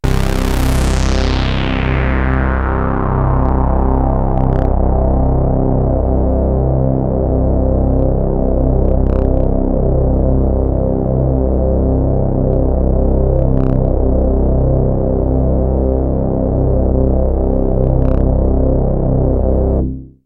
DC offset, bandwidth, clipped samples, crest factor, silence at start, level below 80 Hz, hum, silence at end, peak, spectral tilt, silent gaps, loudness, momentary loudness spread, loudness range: under 0.1%; 10.5 kHz; under 0.1%; 12 dB; 0.05 s; -16 dBFS; none; 0.2 s; 0 dBFS; -8 dB/octave; none; -15 LUFS; 2 LU; 1 LU